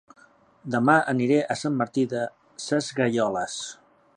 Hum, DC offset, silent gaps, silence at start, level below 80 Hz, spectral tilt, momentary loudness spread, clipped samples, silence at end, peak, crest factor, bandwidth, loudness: none; under 0.1%; none; 0.65 s; -68 dBFS; -5 dB/octave; 14 LU; under 0.1%; 0.45 s; -6 dBFS; 20 dB; 11 kHz; -25 LUFS